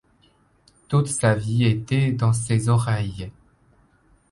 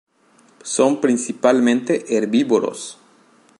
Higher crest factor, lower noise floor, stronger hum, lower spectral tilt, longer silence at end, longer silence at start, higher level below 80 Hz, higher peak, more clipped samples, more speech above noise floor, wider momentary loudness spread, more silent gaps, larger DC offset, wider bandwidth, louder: about the same, 18 dB vs 18 dB; first, -60 dBFS vs -55 dBFS; neither; first, -6 dB/octave vs -4 dB/octave; first, 1 s vs 0.65 s; first, 0.9 s vs 0.65 s; first, -48 dBFS vs -74 dBFS; second, -6 dBFS vs -2 dBFS; neither; about the same, 39 dB vs 37 dB; second, 8 LU vs 13 LU; neither; neither; about the same, 11.5 kHz vs 11.5 kHz; second, -22 LUFS vs -18 LUFS